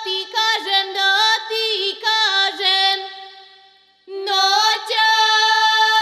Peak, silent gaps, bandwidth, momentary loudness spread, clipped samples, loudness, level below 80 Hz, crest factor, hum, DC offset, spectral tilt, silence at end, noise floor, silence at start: -2 dBFS; none; 14 kHz; 8 LU; under 0.1%; -16 LUFS; -82 dBFS; 16 dB; none; under 0.1%; 3 dB/octave; 0 s; -52 dBFS; 0 s